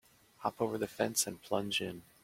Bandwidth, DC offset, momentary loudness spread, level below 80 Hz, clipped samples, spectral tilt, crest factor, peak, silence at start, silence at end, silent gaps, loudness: 16.5 kHz; under 0.1%; 8 LU; -70 dBFS; under 0.1%; -3 dB/octave; 22 dB; -16 dBFS; 0.4 s; 0.2 s; none; -35 LUFS